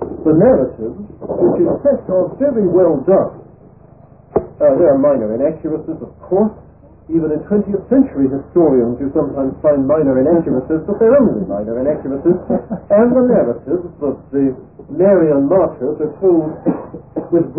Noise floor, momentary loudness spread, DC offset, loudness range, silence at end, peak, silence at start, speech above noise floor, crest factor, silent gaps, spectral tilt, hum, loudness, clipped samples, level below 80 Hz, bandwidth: -43 dBFS; 11 LU; 0.1%; 2 LU; 0 s; -2 dBFS; 0 s; 29 dB; 14 dB; none; -16 dB/octave; none; -15 LUFS; under 0.1%; -44 dBFS; 2.8 kHz